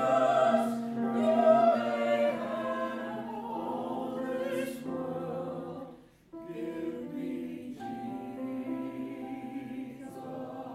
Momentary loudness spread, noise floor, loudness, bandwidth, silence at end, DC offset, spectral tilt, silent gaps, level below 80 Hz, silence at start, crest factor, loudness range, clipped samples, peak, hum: 16 LU; -52 dBFS; -32 LUFS; 14.5 kHz; 0 s; under 0.1%; -6.5 dB/octave; none; -72 dBFS; 0 s; 20 dB; 11 LU; under 0.1%; -12 dBFS; none